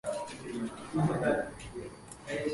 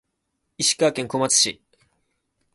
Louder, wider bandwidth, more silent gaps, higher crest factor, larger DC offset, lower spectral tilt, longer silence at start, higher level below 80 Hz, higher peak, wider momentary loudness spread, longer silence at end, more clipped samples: second, -34 LUFS vs -20 LUFS; about the same, 11.5 kHz vs 12 kHz; neither; about the same, 18 dB vs 20 dB; neither; first, -6 dB/octave vs -1.5 dB/octave; second, 0.05 s vs 0.6 s; first, -56 dBFS vs -66 dBFS; second, -16 dBFS vs -4 dBFS; first, 15 LU vs 5 LU; second, 0 s vs 1 s; neither